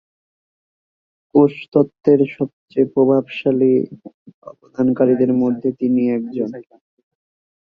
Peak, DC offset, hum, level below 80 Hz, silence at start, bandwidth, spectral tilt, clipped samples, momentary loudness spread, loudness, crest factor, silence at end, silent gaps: -2 dBFS; under 0.1%; none; -62 dBFS; 1.35 s; 4.9 kHz; -10 dB/octave; under 0.1%; 10 LU; -17 LUFS; 18 dB; 1.15 s; 1.68-1.72 s, 2.53-2.68 s, 4.14-4.26 s, 4.34-4.42 s